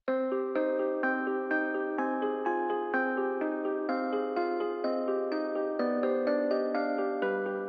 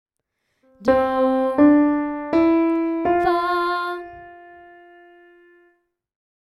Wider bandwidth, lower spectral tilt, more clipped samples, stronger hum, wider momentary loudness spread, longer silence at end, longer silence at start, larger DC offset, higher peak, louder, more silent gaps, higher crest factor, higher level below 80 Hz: second, 5 kHz vs 11.5 kHz; about the same, -7.5 dB/octave vs -7 dB/octave; neither; neither; second, 3 LU vs 11 LU; second, 0 s vs 2.05 s; second, 0.05 s vs 0.8 s; neither; second, -16 dBFS vs -6 dBFS; second, -31 LUFS vs -19 LUFS; neither; about the same, 14 dB vs 16 dB; second, -86 dBFS vs -52 dBFS